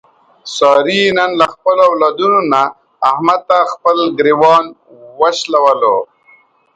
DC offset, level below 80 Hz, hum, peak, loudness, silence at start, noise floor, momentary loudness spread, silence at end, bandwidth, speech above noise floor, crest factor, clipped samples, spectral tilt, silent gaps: under 0.1%; -58 dBFS; none; 0 dBFS; -12 LUFS; 0.45 s; -49 dBFS; 7 LU; 0.7 s; 9.2 kHz; 37 dB; 12 dB; under 0.1%; -4 dB/octave; none